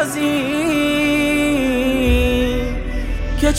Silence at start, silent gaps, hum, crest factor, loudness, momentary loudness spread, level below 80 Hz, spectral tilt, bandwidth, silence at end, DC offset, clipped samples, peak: 0 s; none; none; 12 dB; -18 LUFS; 8 LU; -24 dBFS; -5 dB/octave; 16.5 kHz; 0 s; under 0.1%; under 0.1%; -4 dBFS